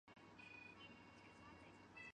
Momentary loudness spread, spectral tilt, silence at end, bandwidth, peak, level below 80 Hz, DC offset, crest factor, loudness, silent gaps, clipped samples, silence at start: 5 LU; -4.5 dB/octave; 0.05 s; 9.6 kHz; -46 dBFS; -80 dBFS; under 0.1%; 16 dB; -61 LUFS; none; under 0.1%; 0.05 s